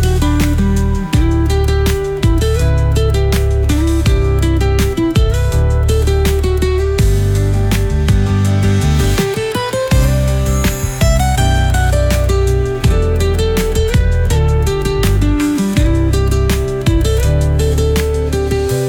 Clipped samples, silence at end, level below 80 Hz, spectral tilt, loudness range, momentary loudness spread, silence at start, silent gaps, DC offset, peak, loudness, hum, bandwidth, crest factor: under 0.1%; 0 s; -16 dBFS; -6 dB/octave; 0 LU; 2 LU; 0 s; none; under 0.1%; -2 dBFS; -14 LUFS; none; 18.5 kHz; 10 dB